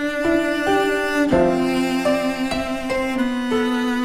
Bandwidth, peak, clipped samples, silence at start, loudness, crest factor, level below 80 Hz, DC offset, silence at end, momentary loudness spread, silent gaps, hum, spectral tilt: 16 kHz; -4 dBFS; under 0.1%; 0 s; -20 LUFS; 14 dB; -42 dBFS; under 0.1%; 0 s; 5 LU; none; none; -5 dB/octave